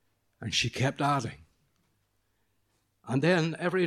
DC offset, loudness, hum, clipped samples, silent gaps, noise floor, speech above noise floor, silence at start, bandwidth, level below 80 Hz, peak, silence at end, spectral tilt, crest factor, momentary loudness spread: under 0.1%; -28 LUFS; none; under 0.1%; none; -74 dBFS; 46 dB; 0.4 s; 14 kHz; -64 dBFS; -12 dBFS; 0 s; -5 dB/octave; 20 dB; 9 LU